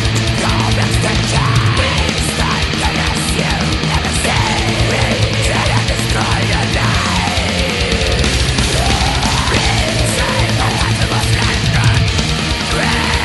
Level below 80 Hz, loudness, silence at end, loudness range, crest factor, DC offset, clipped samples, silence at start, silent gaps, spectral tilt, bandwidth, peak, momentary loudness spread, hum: -22 dBFS; -14 LUFS; 0 s; 1 LU; 14 dB; under 0.1%; under 0.1%; 0 s; none; -4 dB/octave; 12 kHz; 0 dBFS; 2 LU; none